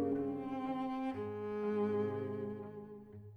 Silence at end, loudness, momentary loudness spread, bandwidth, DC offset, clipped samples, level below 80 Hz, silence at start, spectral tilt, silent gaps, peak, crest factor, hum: 0 s; -39 LUFS; 13 LU; 6.2 kHz; under 0.1%; under 0.1%; -72 dBFS; 0 s; -9 dB/octave; none; -26 dBFS; 12 dB; none